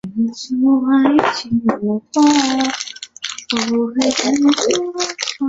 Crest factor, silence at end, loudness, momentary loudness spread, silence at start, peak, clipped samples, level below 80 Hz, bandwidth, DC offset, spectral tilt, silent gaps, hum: 16 dB; 0 s; -16 LUFS; 8 LU; 0.05 s; 0 dBFS; under 0.1%; -56 dBFS; 8 kHz; under 0.1%; -3.5 dB/octave; none; none